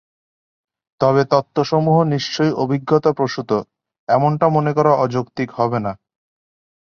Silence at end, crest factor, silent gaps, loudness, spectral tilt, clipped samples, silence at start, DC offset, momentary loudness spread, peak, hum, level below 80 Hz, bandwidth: 0.9 s; 16 dB; 3.99-4.07 s; -18 LUFS; -7 dB/octave; under 0.1%; 1 s; under 0.1%; 7 LU; -2 dBFS; none; -58 dBFS; 7 kHz